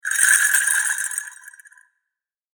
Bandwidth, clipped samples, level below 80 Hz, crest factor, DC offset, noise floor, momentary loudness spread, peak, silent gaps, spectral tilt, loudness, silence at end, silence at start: over 20 kHz; under 0.1%; under -90 dBFS; 22 dB; under 0.1%; -84 dBFS; 14 LU; 0 dBFS; none; 13 dB/octave; -17 LUFS; 1.05 s; 0.05 s